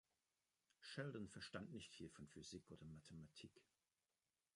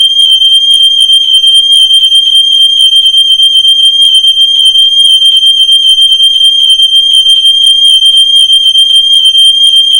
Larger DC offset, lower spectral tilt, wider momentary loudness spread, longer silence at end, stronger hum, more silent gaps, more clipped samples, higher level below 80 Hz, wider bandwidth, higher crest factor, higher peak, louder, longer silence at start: neither; first, -5 dB/octave vs 4.5 dB/octave; first, 10 LU vs 1 LU; first, 0.95 s vs 0 s; neither; neither; second, under 0.1% vs 5%; second, -78 dBFS vs -46 dBFS; second, 11 kHz vs over 20 kHz; first, 24 dB vs 4 dB; second, -34 dBFS vs 0 dBFS; second, -57 LUFS vs -1 LUFS; first, 0.8 s vs 0 s